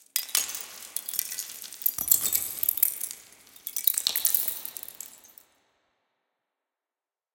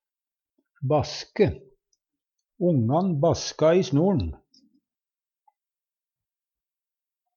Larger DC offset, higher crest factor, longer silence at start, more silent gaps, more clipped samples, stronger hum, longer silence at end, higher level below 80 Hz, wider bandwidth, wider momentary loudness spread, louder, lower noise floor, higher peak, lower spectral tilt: neither; first, 28 dB vs 18 dB; second, 0.15 s vs 0.8 s; neither; neither; neither; second, 2.1 s vs 3 s; second, -70 dBFS vs -50 dBFS; first, 17.5 kHz vs 7.2 kHz; first, 17 LU vs 11 LU; about the same, -26 LUFS vs -24 LUFS; about the same, under -90 dBFS vs under -90 dBFS; first, -2 dBFS vs -8 dBFS; second, 2 dB/octave vs -6.5 dB/octave